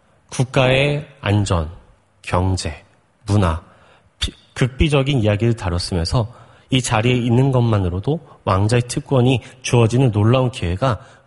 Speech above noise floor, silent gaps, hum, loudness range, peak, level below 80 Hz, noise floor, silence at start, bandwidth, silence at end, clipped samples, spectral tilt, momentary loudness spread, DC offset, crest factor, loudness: 34 dB; none; none; 5 LU; 0 dBFS; -34 dBFS; -51 dBFS; 0.3 s; 11.5 kHz; 0.25 s; under 0.1%; -6 dB/octave; 11 LU; under 0.1%; 18 dB; -18 LUFS